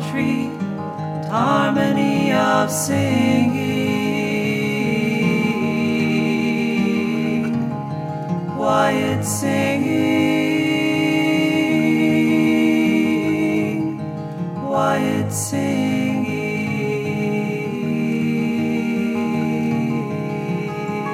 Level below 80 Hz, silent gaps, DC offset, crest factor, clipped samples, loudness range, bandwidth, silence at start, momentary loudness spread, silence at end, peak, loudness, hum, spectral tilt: -64 dBFS; none; under 0.1%; 14 dB; under 0.1%; 4 LU; 16 kHz; 0 s; 8 LU; 0 s; -4 dBFS; -19 LUFS; none; -5.5 dB/octave